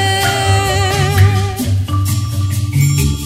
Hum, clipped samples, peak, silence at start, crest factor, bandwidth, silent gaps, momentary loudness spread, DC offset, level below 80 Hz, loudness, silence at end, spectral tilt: none; under 0.1%; 0 dBFS; 0 s; 14 dB; 16 kHz; none; 5 LU; under 0.1%; -28 dBFS; -14 LUFS; 0 s; -4.5 dB/octave